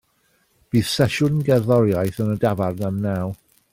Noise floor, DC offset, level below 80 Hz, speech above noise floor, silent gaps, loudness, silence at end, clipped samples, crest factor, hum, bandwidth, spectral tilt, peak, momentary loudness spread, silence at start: -64 dBFS; under 0.1%; -52 dBFS; 44 dB; none; -21 LUFS; 0.4 s; under 0.1%; 16 dB; none; 16.5 kHz; -6.5 dB/octave; -6 dBFS; 7 LU; 0.75 s